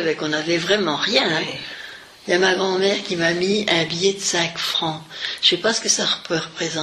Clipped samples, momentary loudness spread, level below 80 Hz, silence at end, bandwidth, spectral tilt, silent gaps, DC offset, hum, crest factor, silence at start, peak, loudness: under 0.1%; 10 LU; -60 dBFS; 0 s; 14 kHz; -2.5 dB/octave; none; under 0.1%; none; 18 dB; 0 s; -2 dBFS; -19 LUFS